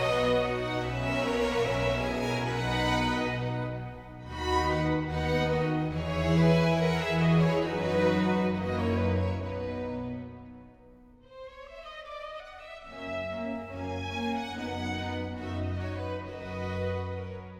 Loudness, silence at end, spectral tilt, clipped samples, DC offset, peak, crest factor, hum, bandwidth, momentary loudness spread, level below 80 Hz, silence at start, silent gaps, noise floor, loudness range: -29 LUFS; 0 s; -6.5 dB/octave; under 0.1%; under 0.1%; -12 dBFS; 18 dB; none; 13 kHz; 16 LU; -46 dBFS; 0 s; none; -54 dBFS; 13 LU